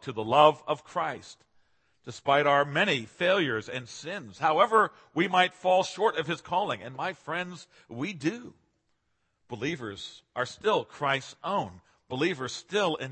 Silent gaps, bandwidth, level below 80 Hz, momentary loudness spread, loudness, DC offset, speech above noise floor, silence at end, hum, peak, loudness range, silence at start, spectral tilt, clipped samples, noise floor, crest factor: none; 8.8 kHz; -72 dBFS; 16 LU; -28 LUFS; under 0.1%; 47 dB; 0 s; none; -6 dBFS; 10 LU; 0 s; -4.5 dB/octave; under 0.1%; -75 dBFS; 22 dB